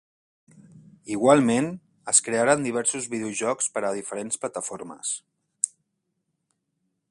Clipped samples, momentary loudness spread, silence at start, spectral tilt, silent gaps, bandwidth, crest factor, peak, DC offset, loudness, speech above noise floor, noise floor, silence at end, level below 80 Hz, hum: under 0.1%; 13 LU; 0.75 s; -3.5 dB/octave; none; 11.5 kHz; 24 dB; -2 dBFS; under 0.1%; -24 LUFS; 54 dB; -78 dBFS; 1.45 s; -68 dBFS; none